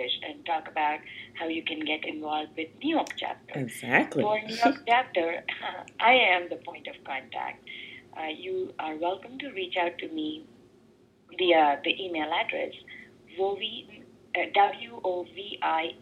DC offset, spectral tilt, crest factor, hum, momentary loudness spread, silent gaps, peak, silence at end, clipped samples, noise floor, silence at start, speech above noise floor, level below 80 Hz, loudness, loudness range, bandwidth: under 0.1%; -4 dB/octave; 24 dB; none; 15 LU; none; -6 dBFS; 0 s; under 0.1%; -60 dBFS; 0 s; 31 dB; -74 dBFS; -28 LUFS; 8 LU; 14 kHz